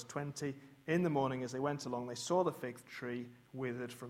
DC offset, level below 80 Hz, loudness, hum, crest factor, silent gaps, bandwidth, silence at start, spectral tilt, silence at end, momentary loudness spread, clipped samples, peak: under 0.1%; -76 dBFS; -39 LUFS; none; 20 dB; none; 16 kHz; 0 s; -5.5 dB/octave; 0 s; 11 LU; under 0.1%; -20 dBFS